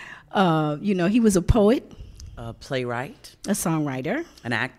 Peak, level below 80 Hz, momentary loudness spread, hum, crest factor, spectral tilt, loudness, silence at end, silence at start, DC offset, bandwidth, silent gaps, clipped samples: -4 dBFS; -38 dBFS; 19 LU; none; 20 dB; -5.5 dB/octave; -23 LUFS; 0.05 s; 0 s; under 0.1%; 16 kHz; none; under 0.1%